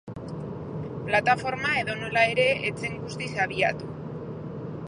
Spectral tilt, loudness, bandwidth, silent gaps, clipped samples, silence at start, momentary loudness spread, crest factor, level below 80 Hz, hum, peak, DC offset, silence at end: -5 dB/octave; -27 LUFS; 11 kHz; none; under 0.1%; 0.05 s; 14 LU; 20 dB; -54 dBFS; none; -6 dBFS; under 0.1%; 0 s